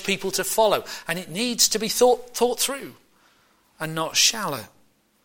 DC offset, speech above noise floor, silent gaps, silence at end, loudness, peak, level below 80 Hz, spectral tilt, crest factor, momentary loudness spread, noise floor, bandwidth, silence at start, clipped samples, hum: under 0.1%; 39 dB; none; 0.6 s; -22 LUFS; -4 dBFS; -58 dBFS; -1.5 dB/octave; 20 dB; 13 LU; -62 dBFS; 17 kHz; 0 s; under 0.1%; none